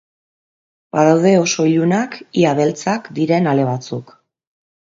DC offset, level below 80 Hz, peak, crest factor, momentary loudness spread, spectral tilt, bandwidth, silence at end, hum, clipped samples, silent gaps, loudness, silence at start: under 0.1%; -62 dBFS; 0 dBFS; 16 dB; 10 LU; -5.5 dB/octave; 7.8 kHz; 0.9 s; none; under 0.1%; none; -16 LUFS; 0.95 s